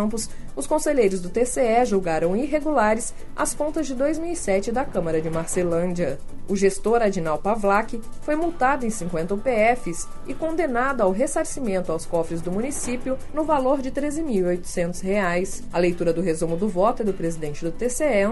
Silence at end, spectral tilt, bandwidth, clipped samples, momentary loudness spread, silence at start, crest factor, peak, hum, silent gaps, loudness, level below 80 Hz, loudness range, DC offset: 0 s; -5 dB/octave; 11.5 kHz; under 0.1%; 7 LU; 0 s; 16 dB; -6 dBFS; none; none; -23 LUFS; -36 dBFS; 3 LU; under 0.1%